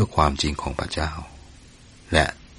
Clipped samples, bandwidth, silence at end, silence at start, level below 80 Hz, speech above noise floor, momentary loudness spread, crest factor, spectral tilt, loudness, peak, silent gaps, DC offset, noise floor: under 0.1%; 11.5 kHz; 0.05 s; 0 s; -34 dBFS; 25 dB; 12 LU; 24 dB; -4.5 dB/octave; -24 LUFS; -2 dBFS; none; under 0.1%; -48 dBFS